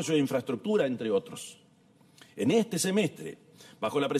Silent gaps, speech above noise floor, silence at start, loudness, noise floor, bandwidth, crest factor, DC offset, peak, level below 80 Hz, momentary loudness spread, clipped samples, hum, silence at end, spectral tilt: none; 32 dB; 0 s; -29 LUFS; -61 dBFS; 14.5 kHz; 16 dB; under 0.1%; -14 dBFS; -74 dBFS; 17 LU; under 0.1%; none; 0 s; -5 dB/octave